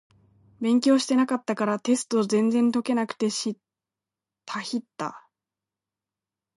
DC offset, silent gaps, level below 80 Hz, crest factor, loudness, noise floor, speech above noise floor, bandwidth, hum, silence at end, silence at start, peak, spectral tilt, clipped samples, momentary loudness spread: under 0.1%; none; -76 dBFS; 16 dB; -25 LUFS; -89 dBFS; 66 dB; 11.5 kHz; none; 1.4 s; 0.6 s; -10 dBFS; -4.5 dB/octave; under 0.1%; 14 LU